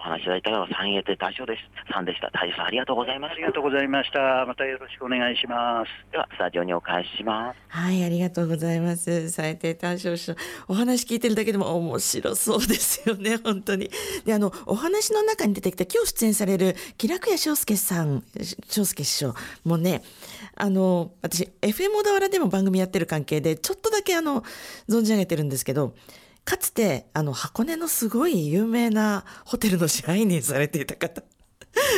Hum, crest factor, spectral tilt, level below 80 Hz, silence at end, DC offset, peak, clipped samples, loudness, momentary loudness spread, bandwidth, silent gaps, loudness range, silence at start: none; 16 dB; -4 dB/octave; -54 dBFS; 0 s; under 0.1%; -10 dBFS; under 0.1%; -25 LUFS; 8 LU; 16.5 kHz; none; 3 LU; 0 s